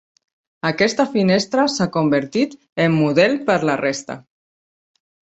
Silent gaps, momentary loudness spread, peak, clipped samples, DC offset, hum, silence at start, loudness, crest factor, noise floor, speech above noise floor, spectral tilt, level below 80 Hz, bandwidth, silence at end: 2.72-2.76 s; 8 LU; -2 dBFS; under 0.1%; under 0.1%; none; 0.65 s; -18 LUFS; 18 dB; under -90 dBFS; over 72 dB; -5.5 dB/octave; -60 dBFS; 8.2 kHz; 1.05 s